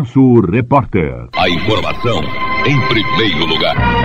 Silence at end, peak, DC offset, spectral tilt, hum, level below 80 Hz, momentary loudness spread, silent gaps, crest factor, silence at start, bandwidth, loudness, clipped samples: 0 s; 0 dBFS; 8%; -7 dB/octave; none; -30 dBFS; 8 LU; none; 14 dB; 0 s; 8 kHz; -13 LUFS; under 0.1%